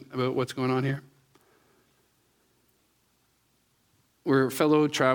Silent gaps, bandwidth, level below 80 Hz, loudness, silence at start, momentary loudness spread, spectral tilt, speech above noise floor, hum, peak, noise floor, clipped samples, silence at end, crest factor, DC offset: none; 19.5 kHz; -72 dBFS; -26 LUFS; 0.1 s; 10 LU; -6 dB/octave; 45 dB; none; -8 dBFS; -69 dBFS; under 0.1%; 0 s; 20 dB; under 0.1%